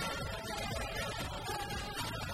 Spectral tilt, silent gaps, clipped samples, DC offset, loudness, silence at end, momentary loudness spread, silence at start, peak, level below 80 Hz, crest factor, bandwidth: -3.5 dB/octave; none; under 0.1%; under 0.1%; -39 LUFS; 0 s; 2 LU; 0 s; -26 dBFS; -48 dBFS; 14 dB; 16 kHz